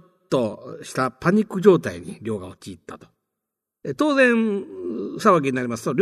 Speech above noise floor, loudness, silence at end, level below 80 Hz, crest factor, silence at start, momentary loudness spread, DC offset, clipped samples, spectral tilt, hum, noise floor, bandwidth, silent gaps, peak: 63 dB; -21 LUFS; 0 s; -62 dBFS; 20 dB; 0.3 s; 19 LU; under 0.1%; under 0.1%; -6 dB/octave; none; -84 dBFS; 13.5 kHz; none; -2 dBFS